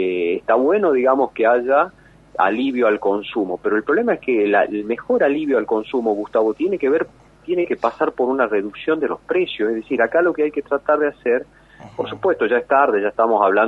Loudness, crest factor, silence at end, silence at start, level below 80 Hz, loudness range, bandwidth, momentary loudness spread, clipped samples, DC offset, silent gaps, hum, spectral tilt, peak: -19 LUFS; 16 dB; 0 s; 0 s; -56 dBFS; 2 LU; 6.2 kHz; 6 LU; under 0.1%; under 0.1%; none; none; -7 dB/octave; -2 dBFS